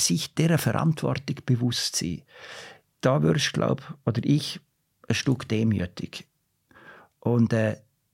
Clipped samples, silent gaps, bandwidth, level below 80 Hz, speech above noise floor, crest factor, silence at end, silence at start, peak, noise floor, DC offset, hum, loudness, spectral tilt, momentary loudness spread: under 0.1%; none; 16.5 kHz; -58 dBFS; 34 dB; 20 dB; 0.35 s; 0 s; -6 dBFS; -59 dBFS; under 0.1%; none; -25 LUFS; -5 dB/octave; 17 LU